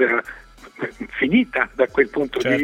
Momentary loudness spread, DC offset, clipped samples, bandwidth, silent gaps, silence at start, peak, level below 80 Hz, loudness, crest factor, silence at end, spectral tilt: 13 LU; under 0.1%; under 0.1%; 12.5 kHz; none; 0 s; -2 dBFS; -50 dBFS; -21 LUFS; 20 dB; 0 s; -6 dB/octave